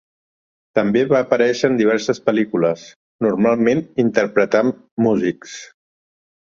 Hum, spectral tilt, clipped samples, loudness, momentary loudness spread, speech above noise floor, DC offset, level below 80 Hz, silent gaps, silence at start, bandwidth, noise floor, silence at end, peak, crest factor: none; -6 dB/octave; under 0.1%; -18 LUFS; 7 LU; over 73 dB; under 0.1%; -60 dBFS; 2.96-3.19 s, 4.91-4.97 s; 0.75 s; 7.6 kHz; under -90 dBFS; 0.95 s; -2 dBFS; 16 dB